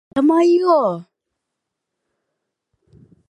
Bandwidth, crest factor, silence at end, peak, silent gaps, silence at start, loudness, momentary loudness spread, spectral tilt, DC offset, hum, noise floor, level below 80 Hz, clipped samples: 10 kHz; 16 dB; 2.25 s; -4 dBFS; none; 0.15 s; -15 LUFS; 10 LU; -7 dB/octave; under 0.1%; none; -80 dBFS; -66 dBFS; under 0.1%